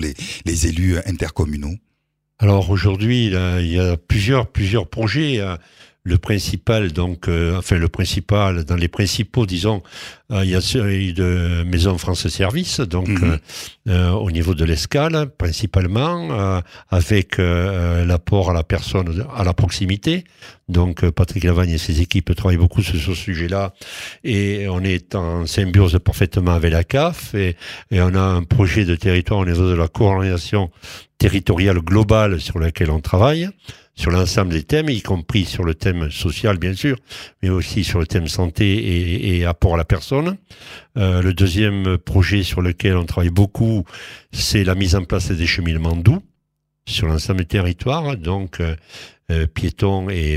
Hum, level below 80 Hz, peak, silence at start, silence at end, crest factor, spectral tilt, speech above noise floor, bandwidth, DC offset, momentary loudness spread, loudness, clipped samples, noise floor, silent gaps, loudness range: none; -30 dBFS; 0 dBFS; 0 s; 0 s; 18 dB; -6 dB/octave; 54 dB; 15 kHz; under 0.1%; 8 LU; -19 LUFS; under 0.1%; -72 dBFS; none; 2 LU